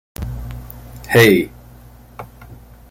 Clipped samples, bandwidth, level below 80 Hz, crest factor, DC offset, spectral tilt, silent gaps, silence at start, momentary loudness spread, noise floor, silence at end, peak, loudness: under 0.1%; 17 kHz; -36 dBFS; 20 dB; under 0.1%; -5.5 dB/octave; none; 0.2 s; 26 LU; -42 dBFS; 0.35 s; 0 dBFS; -15 LUFS